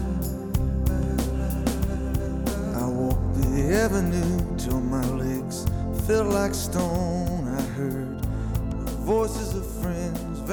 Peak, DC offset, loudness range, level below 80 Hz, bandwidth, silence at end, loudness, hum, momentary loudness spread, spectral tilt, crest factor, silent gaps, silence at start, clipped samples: -10 dBFS; under 0.1%; 2 LU; -30 dBFS; over 20 kHz; 0 s; -26 LUFS; none; 7 LU; -6.5 dB/octave; 16 dB; none; 0 s; under 0.1%